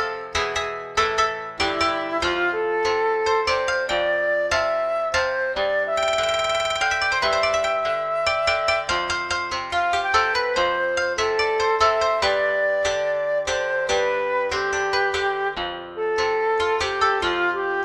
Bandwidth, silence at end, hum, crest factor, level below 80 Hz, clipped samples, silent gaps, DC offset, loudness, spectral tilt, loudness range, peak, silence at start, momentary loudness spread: 13 kHz; 0 s; none; 18 dB; -48 dBFS; under 0.1%; none; under 0.1%; -22 LUFS; -2 dB/octave; 2 LU; -4 dBFS; 0 s; 4 LU